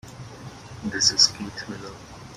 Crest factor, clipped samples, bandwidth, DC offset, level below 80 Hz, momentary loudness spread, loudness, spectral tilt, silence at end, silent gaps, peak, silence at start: 24 dB; under 0.1%; 16 kHz; under 0.1%; -54 dBFS; 25 LU; -19 LUFS; -1 dB/octave; 0 s; none; -4 dBFS; 0.05 s